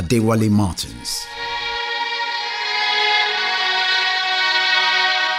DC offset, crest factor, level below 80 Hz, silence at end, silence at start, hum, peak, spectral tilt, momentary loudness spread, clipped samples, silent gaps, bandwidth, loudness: under 0.1%; 14 dB; -46 dBFS; 0 s; 0 s; none; -4 dBFS; -3.5 dB/octave; 10 LU; under 0.1%; none; 16 kHz; -18 LUFS